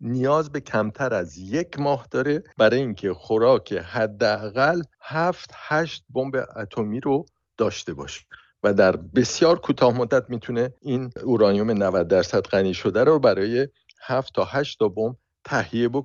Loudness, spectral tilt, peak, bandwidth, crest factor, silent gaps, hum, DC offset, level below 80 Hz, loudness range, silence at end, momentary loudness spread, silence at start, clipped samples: -23 LUFS; -6 dB/octave; -4 dBFS; 7.6 kHz; 18 dB; none; none; under 0.1%; -56 dBFS; 4 LU; 0 s; 10 LU; 0 s; under 0.1%